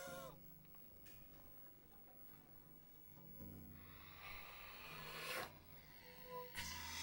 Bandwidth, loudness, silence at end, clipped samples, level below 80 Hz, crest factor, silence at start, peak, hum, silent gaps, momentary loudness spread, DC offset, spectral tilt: over 20 kHz; -54 LUFS; 0 s; under 0.1%; -70 dBFS; 20 dB; 0 s; -36 dBFS; none; none; 12 LU; under 0.1%; -2.5 dB/octave